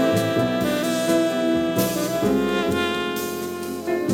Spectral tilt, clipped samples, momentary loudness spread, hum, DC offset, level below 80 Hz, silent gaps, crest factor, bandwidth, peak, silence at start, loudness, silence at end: -5 dB/octave; under 0.1%; 7 LU; none; under 0.1%; -50 dBFS; none; 14 dB; 18 kHz; -8 dBFS; 0 s; -22 LUFS; 0 s